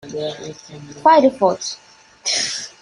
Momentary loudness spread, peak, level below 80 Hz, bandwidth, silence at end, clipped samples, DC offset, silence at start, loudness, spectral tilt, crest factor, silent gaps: 22 LU; -2 dBFS; -62 dBFS; 11.5 kHz; 0.15 s; under 0.1%; under 0.1%; 0.05 s; -18 LUFS; -2.5 dB/octave; 18 dB; none